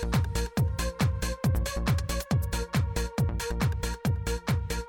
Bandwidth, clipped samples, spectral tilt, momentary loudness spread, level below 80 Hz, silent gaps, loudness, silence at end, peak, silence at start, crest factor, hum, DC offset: 18.5 kHz; under 0.1%; -5.5 dB/octave; 2 LU; -34 dBFS; none; -29 LUFS; 0 s; -14 dBFS; 0 s; 14 dB; none; under 0.1%